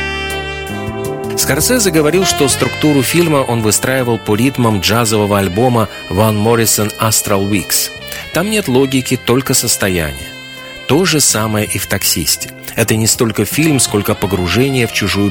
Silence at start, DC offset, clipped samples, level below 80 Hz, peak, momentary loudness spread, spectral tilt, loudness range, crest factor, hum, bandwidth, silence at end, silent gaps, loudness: 0 s; under 0.1%; under 0.1%; -36 dBFS; 0 dBFS; 9 LU; -4 dB/octave; 2 LU; 12 dB; none; 18 kHz; 0 s; none; -13 LUFS